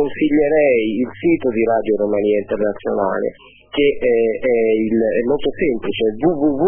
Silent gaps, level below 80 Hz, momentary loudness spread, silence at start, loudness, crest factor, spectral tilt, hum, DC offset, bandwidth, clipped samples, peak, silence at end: none; -44 dBFS; 6 LU; 0 s; -17 LUFS; 12 dB; -10.5 dB/octave; none; under 0.1%; 3.5 kHz; under 0.1%; -4 dBFS; 0 s